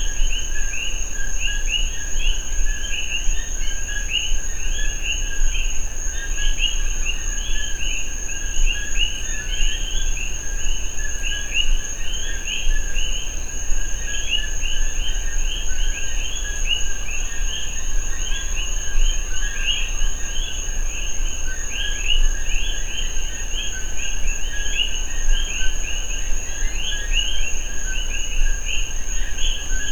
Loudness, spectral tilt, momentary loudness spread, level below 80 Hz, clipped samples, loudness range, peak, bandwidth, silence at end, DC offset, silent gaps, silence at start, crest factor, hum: -25 LUFS; -1 dB/octave; 5 LU; -22 dBFS; under 0.1%; 1 LU; -4 dBFS; 13.5 kHz; 0 s; under 0.1%; none; 0 s; 14 dB; none